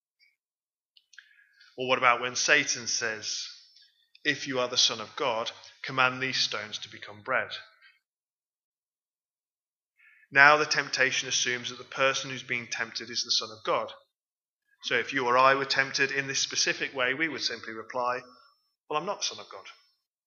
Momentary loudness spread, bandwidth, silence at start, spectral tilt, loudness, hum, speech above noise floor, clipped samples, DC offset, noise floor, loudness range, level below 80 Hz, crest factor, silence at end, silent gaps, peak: 15 LU; 7.6 kHz; 1.75 s; -1 dB/octave; -27 LUFS; none; over 62 dB; under 0.1%; under 0.1%; under -90 dBFS; 7 LU; -86 dBFS; 28 dB; 0.55 s; 8.06-8.96 s, 9.30-9.44 s, 9.61-9.80 s, 9.86-9.90 s, 14.32-14.41 s, 14.48-14.57 s; -2 dBFS